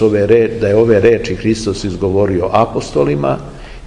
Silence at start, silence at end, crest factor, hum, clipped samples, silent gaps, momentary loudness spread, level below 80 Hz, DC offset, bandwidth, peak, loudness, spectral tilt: 0 s; 0 s; 14 dB; none; under 0.1%; none; 8 LU; -34 dBFS; 0.3%; 10.5 kHz; 0 dBFS; -13 LUFS; -6.5 dB/octave